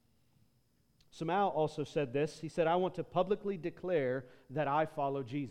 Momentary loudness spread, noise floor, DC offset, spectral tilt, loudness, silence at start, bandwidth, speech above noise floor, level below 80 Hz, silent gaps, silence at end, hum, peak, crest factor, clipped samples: 8 LU; -73 dBFS; under 0.1%; -7 dB/octave; -35 LUFS; 1.15 s; 12 kHz; 39 dB; -68 dBFS; none; 0 s; none; -18 dBFS; 18 dB; under 0.1%